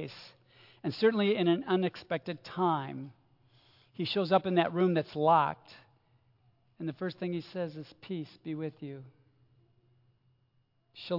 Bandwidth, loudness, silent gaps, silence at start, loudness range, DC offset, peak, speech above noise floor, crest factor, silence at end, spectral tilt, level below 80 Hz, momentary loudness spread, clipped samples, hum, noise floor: 5.8 kHz; -31 LUFS; none; 0 s; 11 LU; under 0.1%; -12 dBFS; 42 dB; 22 dB; 0 s; -8 dB/octave; -78 dBFS; 19 LU; under 0.1%; none; -73 dBFS